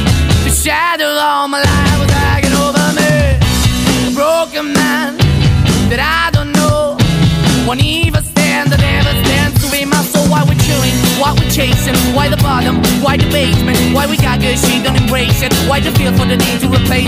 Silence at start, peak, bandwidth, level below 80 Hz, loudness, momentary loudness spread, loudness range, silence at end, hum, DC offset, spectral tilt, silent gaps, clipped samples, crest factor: 0 s; 0 dBFS; 16 kHz; -22 dBFS; -11 LUFS; 2 LU; 0 LU; 0 s; none; under 0.1%; -4.5 dB/octave; none; under 0.1%; 10 dB